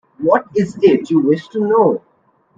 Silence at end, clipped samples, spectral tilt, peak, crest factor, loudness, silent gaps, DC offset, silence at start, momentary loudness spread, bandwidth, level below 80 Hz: 0.6 s; under 0.1%; -8 dB/octave; 0 dBFS; 16 dB; -15 LUFS; none; under 0.1%; 0.2 s; 5 LU; 7.8 kHz; -60 dBFS